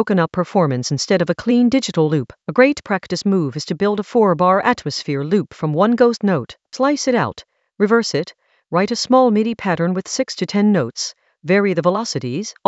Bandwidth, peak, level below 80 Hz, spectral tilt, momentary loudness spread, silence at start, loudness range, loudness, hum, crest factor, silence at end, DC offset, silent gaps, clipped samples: 8.2 kHz; 0 dBFS; -58 dBFS; -5.5 dB/octave; 8 LU; 0 s; 1 LU; -18 LUFS; none; 18 dB; 0.15 s; under 0.1%; none; under 0.1%